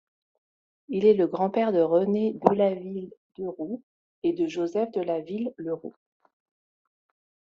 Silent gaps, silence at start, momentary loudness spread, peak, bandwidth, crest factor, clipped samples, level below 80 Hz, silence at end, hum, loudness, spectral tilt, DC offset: 3.17-3.30 s, 3.83-4.22 s; 0.9 s; 15 LU; -2 dBFS; 7.2 kHz; 26 dB; under 0.1%; -72 dBFS; 1.5 s; none; -26 LUFS; -6.5 dB/octave; under 0.1%